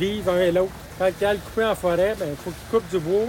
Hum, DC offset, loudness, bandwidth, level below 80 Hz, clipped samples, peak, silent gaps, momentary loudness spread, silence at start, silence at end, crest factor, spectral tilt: none; under 0.1%; -23 LUFS; 17 kHz; -44 dBFS; under 0.1%; -10 dBFS; none; 8 LU; 0 s; 0 s; 14 dB; -5.5 dB/octave